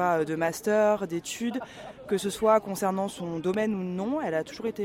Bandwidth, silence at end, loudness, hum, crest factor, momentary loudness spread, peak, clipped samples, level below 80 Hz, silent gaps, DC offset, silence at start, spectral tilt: 16.5 kHz; 0 s; -28 LUFS; none; 18 dB; 9 LU; -10 dBFS; under 0.1%; -62 dBFS; none; under 0.1%; 0 s; -5 dB/octave